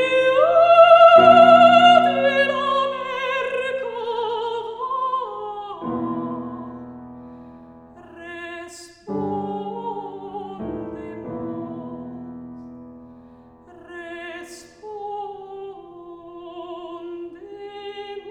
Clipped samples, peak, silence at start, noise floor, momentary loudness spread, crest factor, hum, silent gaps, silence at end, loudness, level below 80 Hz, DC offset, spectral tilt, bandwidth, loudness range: under 0.1%; 0 dBFS; 0 s; -47 dBFS; 27 LU; 20 dB; none; none; 0 s; -16 LUFS; -58 dBFS; under 0.1%; -5 dB/octave; 9.6 kHz; 23 LU